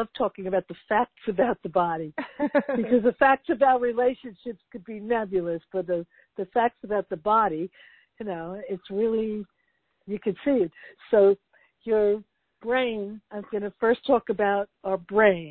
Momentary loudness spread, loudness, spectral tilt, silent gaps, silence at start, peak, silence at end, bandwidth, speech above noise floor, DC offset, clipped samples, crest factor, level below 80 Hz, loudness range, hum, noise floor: 16 LU; -25 LUFS; -10 dB/octave; none; 0 s; -6 dBFS; 0 s; 4.5 kHz; 47 dB; under 0.1%; under 0.1%; 20 dB; -62 dBFS; 5 LU; none; -73 dBFS